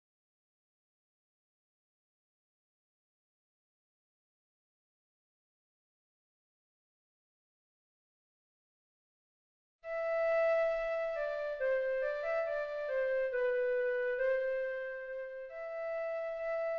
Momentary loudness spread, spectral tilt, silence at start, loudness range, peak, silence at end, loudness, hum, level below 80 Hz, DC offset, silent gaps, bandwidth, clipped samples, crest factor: 11 LU; 2 dB/octave; 9.85 s; 4 LU; -24 dBFS; 0 s; -35 LUFS; none; -70 dBFS; under 0.1%; none; 6.6 kHz; under 0.1%; 14 dB